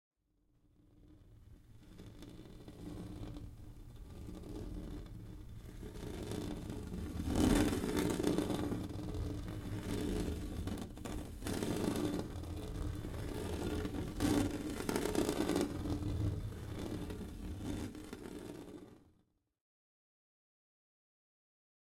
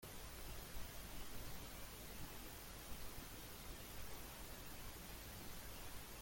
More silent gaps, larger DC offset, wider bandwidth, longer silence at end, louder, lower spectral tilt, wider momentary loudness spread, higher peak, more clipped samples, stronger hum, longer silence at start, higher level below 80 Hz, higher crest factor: neither; neither; about the same, 16.5 kHz vs 17 kHz; first, 3 s vs 0 s; first, -40 LUFS vs -53 LUFS; first, -6 dB/octave vs -3 dB/octave; first, 17 LU vs 1 LU; first, -18 dBFS vs -36 dBFS; neither; neither; first, 0.95 s vs 0 s; first, -50 dBFS vs -58 dBFS; first, 24 dB vs 14 dB